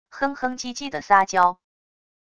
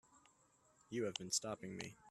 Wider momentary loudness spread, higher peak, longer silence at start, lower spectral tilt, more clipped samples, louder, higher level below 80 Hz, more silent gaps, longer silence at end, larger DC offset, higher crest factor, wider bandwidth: first, 12 LU vs 9 LU; first, -4 dBFS vs -24 dBFS; about the same, 0.1 s vs 0.15 s; about the same, -3 dB/octave vs -3 dB/octave; neither; first, -22 LUFS vs -43 LUFS; first, -60 dBFS vs -80 dBFS; neither; first, 0.75 s vs 0 s; neither; about the same, 20 dB vs 24 dB; second, 11 kHz vs 13.5 kHz